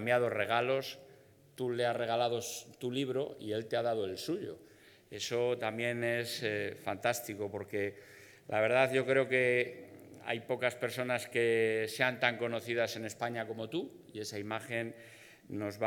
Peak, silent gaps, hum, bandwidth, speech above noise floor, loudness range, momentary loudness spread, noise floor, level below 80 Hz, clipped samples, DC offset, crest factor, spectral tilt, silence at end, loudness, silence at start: -10 dBFS; none; none; 19 kHz; 26 dB; 4 LU; 14 LU; -60 dBFS; -82 dBFS; under 0.1%; under 0.1%; 24 dB; -4.5 dB/octave; 0 s; -34 LUFS; 0 s